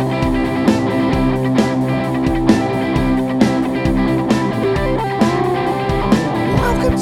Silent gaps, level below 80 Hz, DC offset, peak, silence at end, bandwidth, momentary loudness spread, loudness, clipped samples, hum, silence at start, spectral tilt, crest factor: none; -28 dBFS; under 0.1%; 0 dBFS; 0 s; 15.5 kHz; 2 LU; -16 LUFS; under 0.1%; none; 0 s; -7 dB/octave; 16 dB